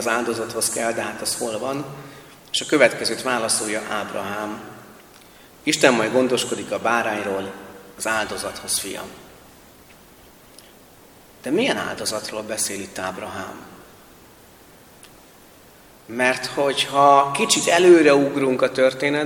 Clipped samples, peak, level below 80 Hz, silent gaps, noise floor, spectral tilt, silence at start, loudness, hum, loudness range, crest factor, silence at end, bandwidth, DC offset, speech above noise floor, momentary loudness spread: under 0.1%; 0 dBFS; -60 dBFS; none; -48 dBFS; -3 dB/octave; 0 s; -20 LUFS; none; 13 LU; 22 dB; 0 s; 19 kHz; under 0.1%; 28 dB; 19 LU